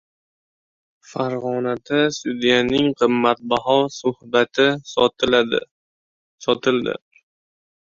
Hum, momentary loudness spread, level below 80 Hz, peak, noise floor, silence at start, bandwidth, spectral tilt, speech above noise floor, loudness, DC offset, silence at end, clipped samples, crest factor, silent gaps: none; 9 LU; -56 dBFS; -2 dBFS; under -90 dBFS; 1.1 s; 7.6 kHz; -4.5 dB/octave; over 71 dB; -20 LUFS; under 0.1%; 0.95 s; under 0.1%; 20 dB; 5.71-6.38 s